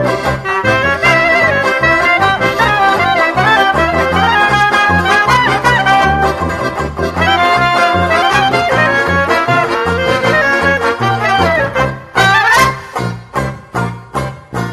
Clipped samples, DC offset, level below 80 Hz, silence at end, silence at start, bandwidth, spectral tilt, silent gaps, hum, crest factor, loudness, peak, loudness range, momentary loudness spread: under 0.1%; under 0.1%; -34 dBFS; 0 s; 0 s; 13.5 kHz; -4.5 dB/octave; none; none; 12 dB; -11 LUFS; 0 dBFS; 2 LU; 10 LU